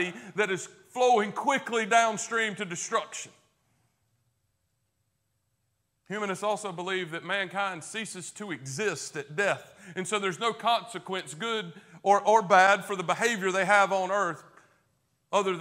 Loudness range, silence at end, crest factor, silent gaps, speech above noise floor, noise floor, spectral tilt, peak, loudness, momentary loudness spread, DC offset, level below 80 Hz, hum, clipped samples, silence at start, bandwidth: 13 LU; 0 s; 22 dB; none; 49 dB; -77 dBFS; -3 dB/octave; -6 dBFS; -27 LUFS; 14 LU; under 0.1%; -80 dBFS; none; under 0.1%; 0 s; 16 kHz